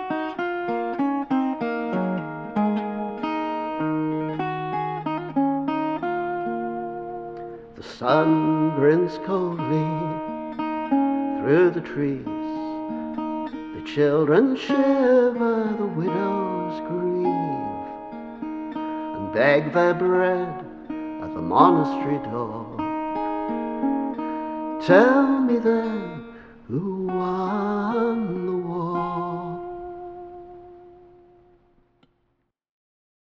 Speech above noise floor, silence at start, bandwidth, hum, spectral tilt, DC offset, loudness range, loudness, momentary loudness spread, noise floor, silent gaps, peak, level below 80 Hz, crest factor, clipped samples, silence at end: 52 dB; 0 s; 7 kHz; none; -8.5 dB/octave; under 0.1%; 6 LU; -23 LUFS; 14 LU; -72 dBFS; none; 0 dBFS; -58 dBFS; 22 dB; under 0.1%; 2.35 s